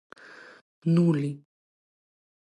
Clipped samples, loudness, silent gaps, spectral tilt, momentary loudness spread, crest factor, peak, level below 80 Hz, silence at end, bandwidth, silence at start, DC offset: under 0.1%; -26 LUFS; none; -9 dB/octave; 24 LU; 18 dB; -12 dBFS; -78 dBFS; 1.05 s; 9.2 kHz; 0.85 s; under 0.1%